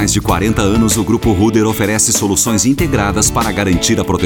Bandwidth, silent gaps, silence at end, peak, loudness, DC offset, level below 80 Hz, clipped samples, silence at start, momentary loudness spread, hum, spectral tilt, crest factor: 19.5 kHz; none; 0 s; 0 dBFS; -13 LUFS; under 0.1%; -28 dBFS; under 0.1%; 0 s; 3 LU; none; -4 dB/octave; 12 dB